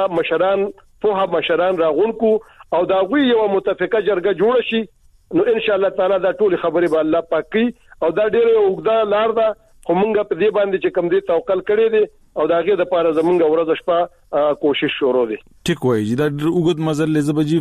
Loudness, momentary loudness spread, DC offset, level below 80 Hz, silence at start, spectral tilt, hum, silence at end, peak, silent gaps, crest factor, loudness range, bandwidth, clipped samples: -17 LUFS; 6 LU; under 0.1%; -52 dBFS; 0 s; -6.5 dB/octave; none; 0 s; -6 dBFS; none; 10 dB; 1 LU; 12.5 kHz; under 0.1%